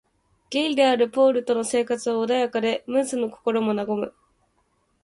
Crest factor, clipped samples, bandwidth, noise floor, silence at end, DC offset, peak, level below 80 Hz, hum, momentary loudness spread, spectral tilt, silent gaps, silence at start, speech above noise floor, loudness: 16 dB; under 0.1%; 11.5 kHz; -68 dBFS; 0.95 s; under 0.1%; -6 dBFS; -68 dBFS; none; 8 LU; -4 dB/octave; none; 0.5 s; 46 dB; -23 LUFS